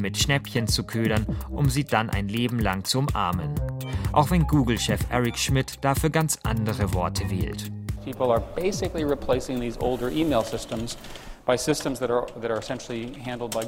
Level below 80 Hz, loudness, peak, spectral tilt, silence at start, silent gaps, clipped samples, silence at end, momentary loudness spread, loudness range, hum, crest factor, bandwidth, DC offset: -38 dBFS; -26 LUFS; -4 dBFS; -5 dB/octave; 0 s; none; under 0.1%; 0 s; 9 LU; 3 LU; none; 22 dB; 16.5 kHz; under 0.1%